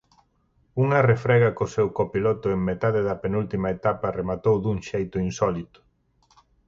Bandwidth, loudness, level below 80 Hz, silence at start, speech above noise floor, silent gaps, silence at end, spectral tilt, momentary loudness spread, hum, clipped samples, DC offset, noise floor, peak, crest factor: 7.6 kHz; -24 LUFS; -48 dBFS; 0.75 s; 42 dB; none; 1.05 s; -7.5 dB/octave; 8 LU; none; under 0.1%; under 0.1%; -65 dBFS; -8 dBFS; 16 dB